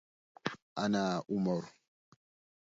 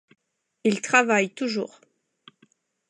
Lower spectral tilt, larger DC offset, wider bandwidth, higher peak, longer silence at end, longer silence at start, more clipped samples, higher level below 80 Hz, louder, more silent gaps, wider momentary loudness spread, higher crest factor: first, -5.5 dB/octave vs -3.5 dB/octave; neither; second, 7.6 kHz vs 11 kHz; second, -14 dBFS vs -6 dBFS; second, 0.9 s vs 1.25 s; second, 0.45 s vs 0.65 s; neither; first, -72 dBFS vs -82 dBFS; second, -35 LUFS vs -23 LUFS; first, 0.62-0.76 s vs none; about the same, 10 LU vs 11 LU; about the same, 24 dB vs 22 dB